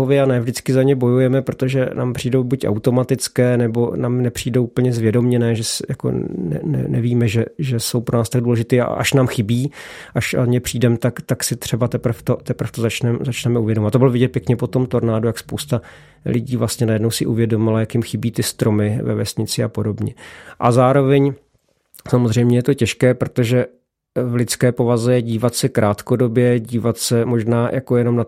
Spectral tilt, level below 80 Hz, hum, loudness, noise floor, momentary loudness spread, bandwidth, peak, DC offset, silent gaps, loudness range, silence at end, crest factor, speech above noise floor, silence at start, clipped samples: -6 dB/octave; -50 dBFS; none; -18 LUFS; -63 dBFS; 7 LU; 16 kHz; 0 dBFS; under 0.1%; none; 2 LU; 0 s; 16 dB; 45 dB; 0 s; under 0.1%